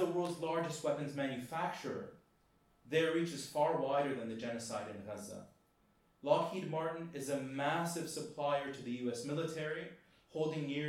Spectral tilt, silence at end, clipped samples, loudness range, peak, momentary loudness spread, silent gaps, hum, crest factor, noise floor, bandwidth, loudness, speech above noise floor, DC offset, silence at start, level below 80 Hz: -5 dB/octave; 0 s; under 0.1%; 2 LU; -16 dBFS; 12 LU; none; none; 22 dB; -72 dBFS; 16.5 kHz; -38 LUFS; 34 dB; under 0.1%; 0 s; -78 dBFS